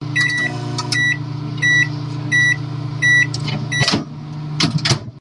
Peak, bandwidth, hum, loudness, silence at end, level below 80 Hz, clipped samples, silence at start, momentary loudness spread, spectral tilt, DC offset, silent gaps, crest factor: -4 dBFS; 11.5 kHz; none; -17 LUFS; 0 s; -52 dBFS; under 0.1%; 0 s; 12 LU; -3.5 dB/octave; under 0.1%; none; 14 dB